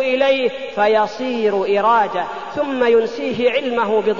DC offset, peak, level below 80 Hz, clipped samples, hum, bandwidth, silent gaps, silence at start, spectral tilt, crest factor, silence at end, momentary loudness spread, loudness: 0.6%; -4 dBFS; -58 dBFS; under 0.1%; none; 7.4 kHz; none; 0 s; -5 dB/octave; 14 dB; 0 s; 7 LU; -17 LUFS